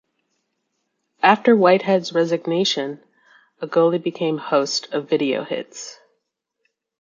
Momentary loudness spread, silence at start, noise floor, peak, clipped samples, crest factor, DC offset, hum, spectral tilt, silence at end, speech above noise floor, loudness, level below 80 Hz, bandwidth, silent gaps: 17 LU; 1.25 s; -76 dBFS; -2 dBFS; under 0.1%; 20 dB; under 0.1%; none; -4.5 dB/octave; 1.1 s; 57 dB; -19 LUFS; -74 dBFS; 7.6 kHz; none